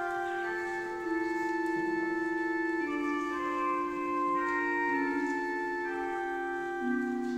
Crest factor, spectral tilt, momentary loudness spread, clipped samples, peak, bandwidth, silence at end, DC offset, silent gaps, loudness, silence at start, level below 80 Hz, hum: 12 dB; -5 dB/octave; 4 LU; under 0.1%; -20 dBFS; 10 kHz; 0 s; under 0.1%; none; -32 LUFS; 0 s; -66 dBFS; none